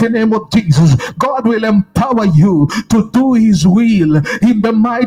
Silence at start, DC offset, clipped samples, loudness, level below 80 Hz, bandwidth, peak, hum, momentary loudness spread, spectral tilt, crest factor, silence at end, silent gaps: 0 s; under 0.1%; under 0.1%; -11 LUFS; -38 dBFS; 13.5 kHz; 0 dBFS; none; 4 LU; -7 dB/octave; 10 dB; 0 s; none